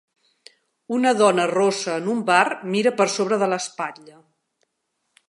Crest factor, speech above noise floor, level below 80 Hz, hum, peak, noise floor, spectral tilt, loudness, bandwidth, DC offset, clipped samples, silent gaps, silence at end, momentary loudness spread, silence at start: 20 dB; 55 dB; -78 dBFS; none; -2 dBFS; -75 dBFS; -4 dB/octave; -21 LUFS; 11.5 kHz; under 0.1%; under 0.1%; none; 1.2 s; 10 LU; 0.9 s